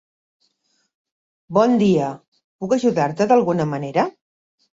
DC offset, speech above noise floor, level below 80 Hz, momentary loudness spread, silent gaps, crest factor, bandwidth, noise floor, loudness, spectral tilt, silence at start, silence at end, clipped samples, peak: under 0.1%; 50 dB; -62 dBFS; 11 LU; 2.28-2.32 s, 2.44-2.59 s; 18 dB; 7.8 kHz; -68 dBFS; -19 LUFS; -7 dB/octave; 1.5 s; 0.65 s; under 0.1%; -2 dBFS